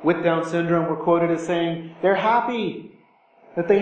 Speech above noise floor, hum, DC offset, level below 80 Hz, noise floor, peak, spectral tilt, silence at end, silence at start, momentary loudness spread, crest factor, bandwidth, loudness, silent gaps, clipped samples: 35 dB; none; under 0.1%; -66 dBFS; -56 dBFS; -4 dBFS; -7 dB/octave; 0 s; 0 s; 9 LU; 16 dB; 8.8 kHz; -22 LUFS; none; under 0.1%